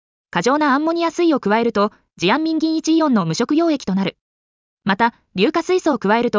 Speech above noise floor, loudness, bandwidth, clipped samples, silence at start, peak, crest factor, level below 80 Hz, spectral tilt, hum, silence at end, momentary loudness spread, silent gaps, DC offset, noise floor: over 73 dB; -18 LUFS; 7.6 kHz; under 0.1%; 0.35 s; -4 dBFS; 14 dB; -58 dBFS; -5.5 dB/octave; none; 0 s; 6 LU; 4.21-4.77 s; under 0.1%; under -90 dBFS